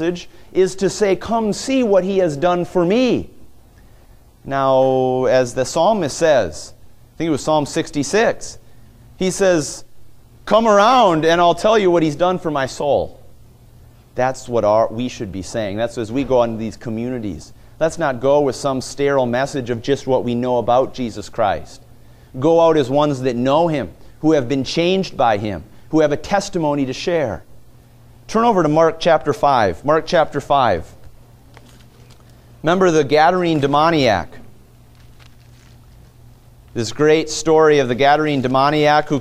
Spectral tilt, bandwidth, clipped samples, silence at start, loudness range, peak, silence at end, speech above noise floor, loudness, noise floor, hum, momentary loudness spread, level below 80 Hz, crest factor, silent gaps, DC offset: -5 dB/octave; 15 kHz; under 0.1%; 0 s; 5 LU; 0 dBFS; 0 s; 30 dB; -17 LUFS; -46 dBFS; none; 11 LU; -44 dBFS; 16 dB; none; under 0.1%